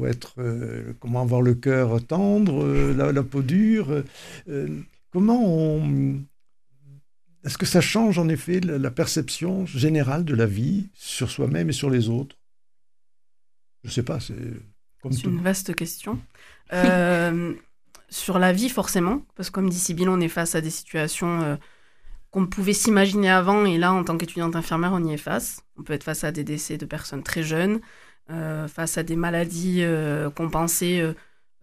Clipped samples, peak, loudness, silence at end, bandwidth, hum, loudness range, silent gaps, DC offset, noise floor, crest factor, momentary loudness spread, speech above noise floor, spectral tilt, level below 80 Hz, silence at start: under 0.1%; -4 dBFS; -23 LUFS; 0.45 s; 15.5 kHz; none; 7 LU; none; 0.2%; -89 dBFS; 20 dB; 13 LU; 67 dB; -5.5 dB/octave; -44 dBFS; 0 s